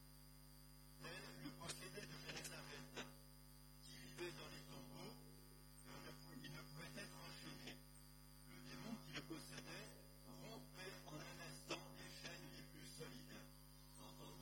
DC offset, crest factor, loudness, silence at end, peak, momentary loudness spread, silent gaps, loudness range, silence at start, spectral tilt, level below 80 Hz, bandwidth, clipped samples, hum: under 0.1%; 22 dB; -56 LUFS; 0 s; -36 dBFS; 11 LU; none; 3 LU; 0 s; -3.5 dB/octave; -70 dBFS; 17.5 kHz; under 0.1%; 50 Hz at -65 dBFS